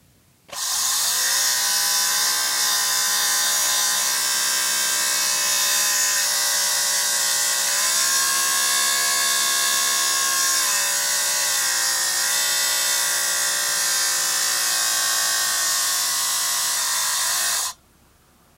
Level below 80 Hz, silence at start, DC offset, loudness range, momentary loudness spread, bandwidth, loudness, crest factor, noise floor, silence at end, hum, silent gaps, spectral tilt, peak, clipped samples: -66 dBFS; 0.5 s; under 0.1%; 1 LU; 2 LU; 16 kHz; -18 LUFS; 14 dB; -56 dBFS; 0.85 s; none; none; 3 dB/octave; -6 dBFS; under 0.1%